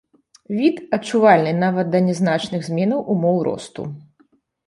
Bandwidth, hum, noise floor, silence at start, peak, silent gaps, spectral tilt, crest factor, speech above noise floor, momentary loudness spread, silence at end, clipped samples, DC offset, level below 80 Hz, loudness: 11 kHz; none; -60 dBFS; 0.5 s; -2 dBFS; none; -7 dB/octave; 18 dB; 41 dB; 16 LU; 0.65 s; under 0.1%; under 0.1%; -62 dBFS; -19 LUFS